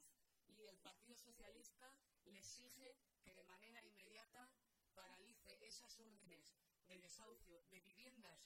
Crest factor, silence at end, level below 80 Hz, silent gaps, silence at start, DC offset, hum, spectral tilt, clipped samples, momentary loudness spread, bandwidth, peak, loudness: 20 dB; 0 s; -84 dBFS; none; 0 s; under 0.1%; none; -1.5 dB/octave; under 0.1%; 8 LU; 16.5 kHz; -48 dBFS; -65 LUFS